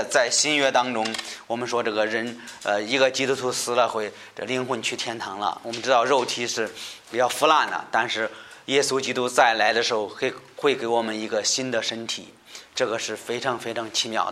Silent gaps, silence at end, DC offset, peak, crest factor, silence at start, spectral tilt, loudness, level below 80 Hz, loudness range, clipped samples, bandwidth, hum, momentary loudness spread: none; 0 s; under 0.1%; -4 dBFS; 22 dB; 0 s; -2 dB/octave; -24 LUFS; -72 dBFS; 4 LU; under 0.1%; 16 kHz; none; 12 LU